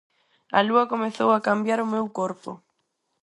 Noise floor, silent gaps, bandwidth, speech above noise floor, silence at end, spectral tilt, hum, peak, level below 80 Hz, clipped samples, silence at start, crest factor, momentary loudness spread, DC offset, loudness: -75 dBFS; none; 11 kHz; 52 dB; 0.7 s; -5.5 dB/octave; none; -4 dBFS; -74 dBFS; under 0.1%; 0.5 s; 20 dB; 10 LU; under 0.1%; -23 LUFS